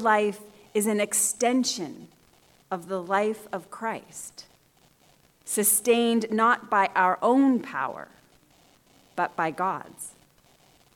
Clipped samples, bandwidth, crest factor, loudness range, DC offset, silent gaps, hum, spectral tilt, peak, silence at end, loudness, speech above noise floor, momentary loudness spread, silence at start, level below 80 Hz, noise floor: under 0.1%; 18 kHz; 18 dB; 10 LU; under 0.1%; none; none; -3 dB/octave; -8 dBFS; 0.85 s; -25 LUFS; 36 dB; 18 LU; 0 s; -72 dBFS; -61 dBFS